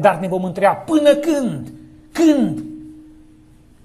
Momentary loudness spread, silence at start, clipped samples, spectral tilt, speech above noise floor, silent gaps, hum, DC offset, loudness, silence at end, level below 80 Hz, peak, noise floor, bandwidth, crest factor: 18 LU; 0 s; under 0.1%; -6 dB/octave; 31 dB; none; none; under 0.1%; -17 LUFS; 0.85 s; -52 dBFS; 0 dBFS; -47 dBFS; 13.5 kHz; 18 dB